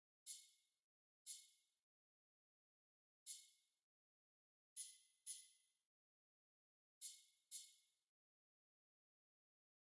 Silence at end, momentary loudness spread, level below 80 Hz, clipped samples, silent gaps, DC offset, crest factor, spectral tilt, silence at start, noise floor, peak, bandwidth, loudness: 2.15 s; 8 LU; under -90 dBFS; under 0.1%; 0.82-1.26 s, 1.82-3.26 s, 3.82-4.76 s, 5.85-7.01 s; under 0.1%; 24 dB; 6 dB/octave; 0.25 s; under -90 dBFS; -42 dBFS; 12 kHz; -58 LUFS